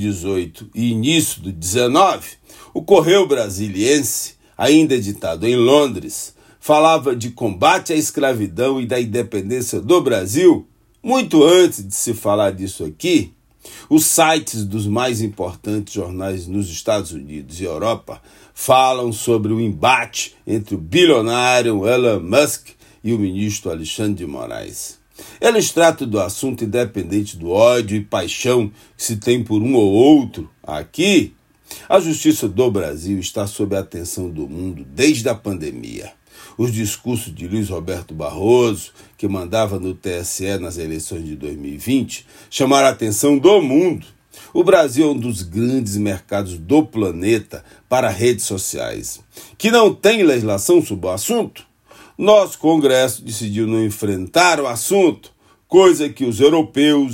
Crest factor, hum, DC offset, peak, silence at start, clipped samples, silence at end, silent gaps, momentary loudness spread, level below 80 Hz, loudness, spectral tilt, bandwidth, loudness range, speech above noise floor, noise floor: 16 dB; none; under 0.1%; 0 dBFS; 0 s; under 0.1%; 0 s; none; 15 LU; -52 dBFS; -17 LUFS; -4.5 dB/octave; 16.5 kHz; 6 LU; 30 dB; -47 dBFS